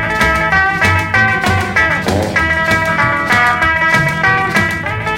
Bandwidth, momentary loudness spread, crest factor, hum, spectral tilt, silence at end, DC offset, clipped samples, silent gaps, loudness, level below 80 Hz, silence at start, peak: 16.5 kHz; 3 LU; 12 dB; none; -4.5 dB/octave; 0 s; under 0.1%; under 0.1%; none; -12 LUFS; -32 dBFS; 0 s; 0 dBFS